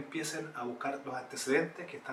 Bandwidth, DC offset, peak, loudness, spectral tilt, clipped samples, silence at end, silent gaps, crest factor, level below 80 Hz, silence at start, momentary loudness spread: 16 kHz; under 0.1%; -14 dBFS; -36 LUFS; -3.5 dB/octave; under 0.1%; 0 s; none; 22 dB; -86 dBFS; 0 s; 9 LU